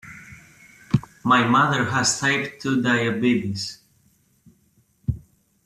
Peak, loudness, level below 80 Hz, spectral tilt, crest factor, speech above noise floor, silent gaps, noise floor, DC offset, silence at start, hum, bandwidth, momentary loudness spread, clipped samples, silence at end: -4 dBFS; -21 LUFS; -50 dBFS; -4 dB/octave; 18 dB; 42 dB; none; -62 dBFS; under 0.1%; 0.05 s; none; 14 kHz; 14 LU; under 0.1%; 0.45 s